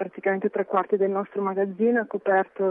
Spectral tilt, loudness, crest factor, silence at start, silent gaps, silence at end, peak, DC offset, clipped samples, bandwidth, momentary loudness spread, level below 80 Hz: -10.5 dB/octave; -25 LUFS; 16 dB; 0 s; none; 0 s; -8 dBFS; under 0.1%; under 0.1%; 3.7 kHz; 4 LU; -80 dBFS